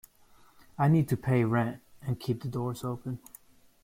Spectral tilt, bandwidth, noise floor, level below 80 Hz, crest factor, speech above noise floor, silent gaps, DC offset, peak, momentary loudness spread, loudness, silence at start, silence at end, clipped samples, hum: -8 dB/octave; 16.5 kHz; -59 dBFS; -60 dBFS; 16 dB; 31 dB; none; under 0.1%; -14 dBFS; 15 LU; -30 LUFS; 0.8 s; 0.65 s; under 0.1%; none